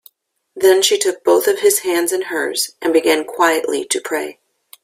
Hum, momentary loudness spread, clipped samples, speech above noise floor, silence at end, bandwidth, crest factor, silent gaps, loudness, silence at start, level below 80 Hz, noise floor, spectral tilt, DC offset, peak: none; 7 LU; under 0.1%; 37 dB; 0.5 s; 16 kHz; 16 dB; none; -16 LUFS; 0.55 s; -64 dBFS; -53 dBFS; -1 dB/octave; under 0.1%; 0 dBFS